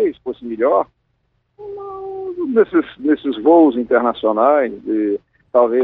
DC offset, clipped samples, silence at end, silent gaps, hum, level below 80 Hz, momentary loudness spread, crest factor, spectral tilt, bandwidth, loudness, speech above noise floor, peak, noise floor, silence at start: under 0.1%; under 0.1%; 0 s; none; none; -58 dBFS; 16 LU; 16 dB; -9 dB/octave; 4.1 kHz; -17 LUFS; 51 dB; -2 dBFS; -66 dBFS; 0 s